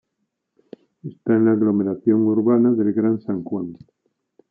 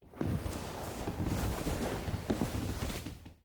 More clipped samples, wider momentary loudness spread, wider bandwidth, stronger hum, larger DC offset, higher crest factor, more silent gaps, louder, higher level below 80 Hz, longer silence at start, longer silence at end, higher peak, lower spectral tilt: neither; first, 13 LU vs 5 LU; second, 2.5 kHz vs over 20 kHz; neither; neither; about the same, 16 dB vs 18 dB; neither; first, -19 LUFS vs -37 LUFS; second, -70 dBFS vs -44 dBFS; first, 1.05 s vs 0 s; first, 0.75 s vs 0.1 s; first, -6 dBFS vs -18 dBFS; first, -13.5 dB/octave vs -5.5 dB/octave